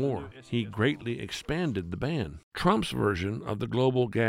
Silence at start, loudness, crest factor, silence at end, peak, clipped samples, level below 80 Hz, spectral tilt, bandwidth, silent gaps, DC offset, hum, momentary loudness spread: 0 s; -30 LUFS; 20 dB; 0 s; -8 dBFS; under 0.1%; -52 dBFS; -6.5 dB/octave; 15.5 kHz; 2.43-2.51 s; under 0.1%; none; 8 LU